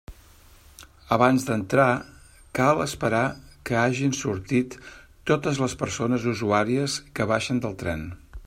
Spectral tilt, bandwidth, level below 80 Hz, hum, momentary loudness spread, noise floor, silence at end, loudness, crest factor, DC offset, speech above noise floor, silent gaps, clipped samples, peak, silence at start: -5.5 dB/octave; 16 kHz; -50 dBFS; none; 10 LU; -52 dBFS; 0 s; -24 LUFS; 22 dB; under 0.1%; 28 dB; none; under 0.1%; -4 dBFS; 0.1 s